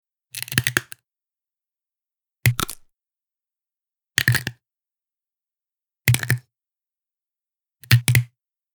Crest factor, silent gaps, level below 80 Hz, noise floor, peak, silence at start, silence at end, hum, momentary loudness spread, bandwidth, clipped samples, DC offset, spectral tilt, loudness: 26 dB; none; -50 dBFS; under -90 dBFS; -2 dBFS; 0.35 s; 0.5 s; none; 17 LU; over 20 kHz; under 0.1%; under 0.1%; -3.5 dB/octave; -21 LUFS